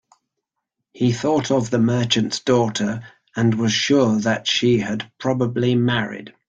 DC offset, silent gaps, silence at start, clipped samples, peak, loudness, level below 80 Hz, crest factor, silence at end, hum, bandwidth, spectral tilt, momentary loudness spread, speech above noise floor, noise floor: under 0.1%; none; 0.95 s; under 0.1%; -4 dBFS; -20 LUFS; -56 dBFS; 16 dB; 0.2 s; none; 9 kHz; -5 dB/octave; 8 LU; 61 dB; -80 dBFS